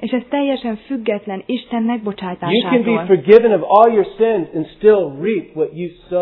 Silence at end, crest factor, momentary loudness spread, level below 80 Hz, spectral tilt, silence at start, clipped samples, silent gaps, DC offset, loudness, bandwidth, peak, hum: 0 s; 16 dB; 13 LU; -54 dBFS; -9.5 dB/octave; 0 s; 0.2%; none; under 0.1%; -16 LUFS; 5.4 kHz; 0 dBFS; none